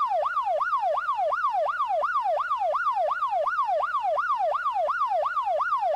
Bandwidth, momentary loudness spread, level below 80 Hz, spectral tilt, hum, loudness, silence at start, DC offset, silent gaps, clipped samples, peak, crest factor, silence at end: 12.5 kHz; 1 LU; -66 dBFS; -1.5 dB/octave; none; -26 LUFS; 0 s; under 0.1%; none; under 0.1%; -18 dBFS; 8 dB; 0 s